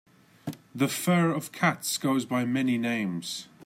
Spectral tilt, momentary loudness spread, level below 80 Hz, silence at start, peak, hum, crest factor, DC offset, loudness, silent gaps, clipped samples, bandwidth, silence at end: -5 dB/octave; 15 LU; -74 dBFS; 0.45 s; -10 dBFS; none; 18 dB; under 0.1%; -27 LUFS; none; under 0.1%; 16 kHz; 0.05 s